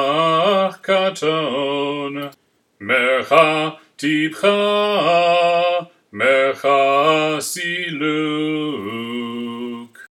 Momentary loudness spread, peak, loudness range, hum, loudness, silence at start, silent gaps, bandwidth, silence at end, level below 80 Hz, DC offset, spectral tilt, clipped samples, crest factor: 12 LU; 0 dBFS; 3 LU; none; -18 LUFS; 0 s; none; 16.5 kHz; 0.1 s; -74 dBFS; under 0.1%; -4 dB/octave; under 0.1%; 18 dB